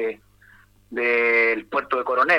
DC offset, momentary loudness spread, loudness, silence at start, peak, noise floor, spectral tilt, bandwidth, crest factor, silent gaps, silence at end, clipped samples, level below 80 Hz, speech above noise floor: under 0.1%; 14 LU; -21 LUFS; 0 s; -6 dBFS; -53 dBFS; -4.5 dB/octave; 12 kHz; 18 dB; none; 0 s; under 0.1%; -62 dBFS; 32 dB